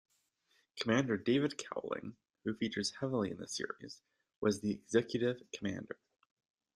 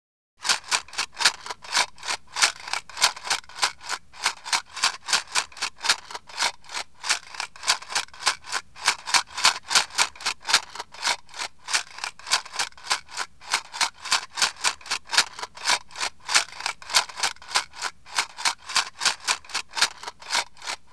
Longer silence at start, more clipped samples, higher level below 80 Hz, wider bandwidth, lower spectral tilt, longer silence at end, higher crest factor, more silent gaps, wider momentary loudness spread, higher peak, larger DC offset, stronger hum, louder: first, 0.75 s vs 0.4 s; neither; second, -74 dBFS vs -64 dBFS; first, 12.5 kHz vs 11 kHz; first, -5 dB/octave vs 2.5 dB/octave; first, 0.8 s vs 0.2 s; about the same, 22 dB vs 26 dB; first, 4.36-4.42 s vs none; first, 17 LU vs 9 LU; second, -16 dBFS vs -2 dBFS; second, under 0.1% vs 0.4%; neither; second, -37 LUFS vs -25 LUFS